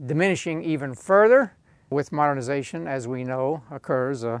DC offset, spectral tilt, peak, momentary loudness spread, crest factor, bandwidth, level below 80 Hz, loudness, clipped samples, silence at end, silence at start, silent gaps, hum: under 0.1%; -6.5 dB/octave; -6 dBFS; 12 LU; 18 dB; 10.5 kHz; -66 dBFS; -23 LUFS; under 0.1%; 0 s; 0 s; none; none